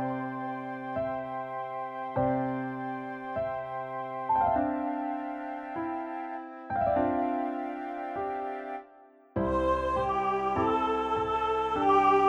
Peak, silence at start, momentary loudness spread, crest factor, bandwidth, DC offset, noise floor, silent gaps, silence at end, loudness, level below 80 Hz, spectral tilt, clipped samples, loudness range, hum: -12 dBFS; 0 s; 9 LU; 18 dB; 9.2 kHz; under 0.1%; -56 dBFS; none; 0 s; -31 LUFS; -52 dBFS; -7.5 dB/octave; under 0.1%; 4 LU; none